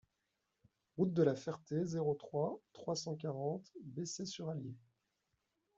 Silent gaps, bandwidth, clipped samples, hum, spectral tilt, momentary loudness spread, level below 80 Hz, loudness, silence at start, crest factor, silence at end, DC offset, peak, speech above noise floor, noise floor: none; 8 kHz; under 0.1%; none; -6 dB/octave; 13 LU; -80 dBFS; -40 LUFS; 0.95 s; 22 dB; 1 s; under 0.1%; -20 dBFS; 47 dB; -86 dBFS